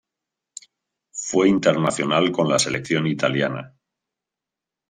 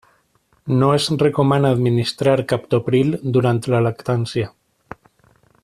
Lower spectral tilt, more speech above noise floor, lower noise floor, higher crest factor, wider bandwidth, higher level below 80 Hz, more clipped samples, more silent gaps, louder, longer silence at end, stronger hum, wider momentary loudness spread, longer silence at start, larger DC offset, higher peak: second, -4.5 dB/octave vs -7 dB/octave; first, 67 dB vs 44 dB; first, -87 dBFS vs -61 dBFS; about the same, 18 dB vs 16 dB; about the same, 13 kHz vs 13 kHz; second, -62 dBFS vs -52 dBFS; neither; neither; about the same, -20 LUFS vs -18 LUFS; about the same, 1.2 s vs 1.15 s; neither; first, 22 LU vs 6 LU; first, 1.15 s vs 0.65 s; neither; about the same, -4 dBFS vs -2 dBFS